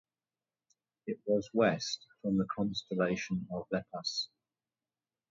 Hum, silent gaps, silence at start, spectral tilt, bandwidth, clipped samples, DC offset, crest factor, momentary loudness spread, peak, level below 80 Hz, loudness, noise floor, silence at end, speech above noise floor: none; none; 1.05 s; -5 dB/octave; 7.6 kHz; under 0.1%; under 0.1%; 20 dB; 10 LU; -16 dBFS; -68 dBFS; -34 LUFS; under -90 dBFS; 1.05 s; over 56 dB